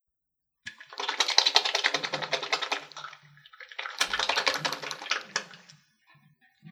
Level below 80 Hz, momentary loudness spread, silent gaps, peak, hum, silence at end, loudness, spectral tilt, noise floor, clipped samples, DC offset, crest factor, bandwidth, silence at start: -72 dBFS; 22 LU; none; -2 dBFS; none; 0 s; -27 LUFS; 0 dB/octave; -83 dBFS; under 0.1%; under 0.1%; 30 dB; over 20 kHz; 0.65 s